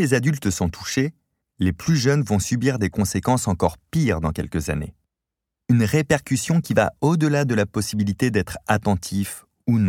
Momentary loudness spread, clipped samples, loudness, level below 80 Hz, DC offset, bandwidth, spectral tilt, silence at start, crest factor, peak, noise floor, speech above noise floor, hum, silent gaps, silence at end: 7 LU; under 0.1%; -22 LUFS; -42 dBFS; under 0.1%; 17 kHz; -6 dB/octave; 0 s; 18 dB; -4 dBFS; -85 dBFS; 64 dB; none; none; 0 s